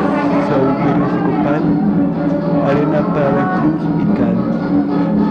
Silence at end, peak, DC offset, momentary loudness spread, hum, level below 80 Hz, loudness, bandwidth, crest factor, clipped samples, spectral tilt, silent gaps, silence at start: 0 s; -4 dBFS; under 0.1%; 2 LU; none; -42 dBFS; -15 LUFS; 6.4 kHz; 10 dB; under 0.1%; -9.5 dB/octave; none; 0 s